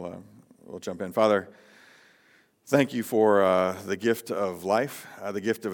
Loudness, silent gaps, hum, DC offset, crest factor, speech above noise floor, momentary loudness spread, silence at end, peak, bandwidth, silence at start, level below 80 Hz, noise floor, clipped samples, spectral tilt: -26 LUFS; none; none; under 0.1%; 20 dB; 37 dB; 16 LU; 0 s; -6 dBFS; 18 kHz; 0 s; -78 dBFS; -62 dBFS; under 0.1%; -5.5 dB/octave